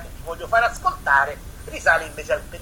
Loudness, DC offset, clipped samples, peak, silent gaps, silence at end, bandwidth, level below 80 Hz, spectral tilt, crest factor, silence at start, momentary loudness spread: -21 LUFS; under 0.1%; under 0.1%; -4 dBFS; none; 0 s; 19.5 kHz; -40 dBFS; -3 dB/octave; 18 dB; 0 s; 16 LU